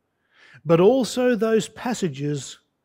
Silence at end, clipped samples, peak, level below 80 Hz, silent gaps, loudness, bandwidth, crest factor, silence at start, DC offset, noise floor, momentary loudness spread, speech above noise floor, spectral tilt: 0.3 s; under 0.1%; -6 dBFS; -64 dBFS; none; -21 LUFS; 16 kHz; 16 dB; 0.65 s; under 0.1%; -57 dBFS; 14 LU; 36 dB; -5.5 dB/octave